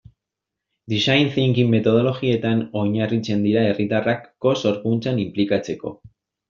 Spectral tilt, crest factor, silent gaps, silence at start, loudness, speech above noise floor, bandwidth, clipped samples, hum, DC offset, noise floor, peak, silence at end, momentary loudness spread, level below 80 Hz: -5.5 dB/octave; 18 dB; none; 0.9 s; -20 LUFS; 64 dB; 7.4 kHz; under 0.1%; none; under 0.1%; -84 dBFS; -2 dBFS; 0.55 s; 6 LU; -58 dBFS